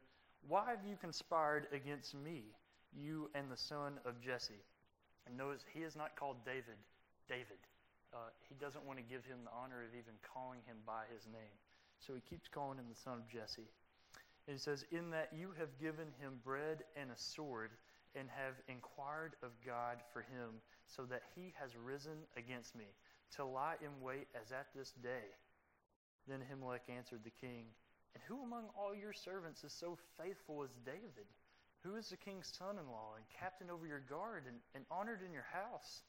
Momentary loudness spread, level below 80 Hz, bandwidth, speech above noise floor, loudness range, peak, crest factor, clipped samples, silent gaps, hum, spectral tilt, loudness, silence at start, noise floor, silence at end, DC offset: 13 LU; -82 dBFS; 16 kHz; 27 dB; 6 LU; -26 dBFS; 24 dB; under 0.1%; 25.96-26.19 s; none; -4.5 dB/octave; -49 LUFS; 0 s; -76 dBFS; 0 s; under 0.1%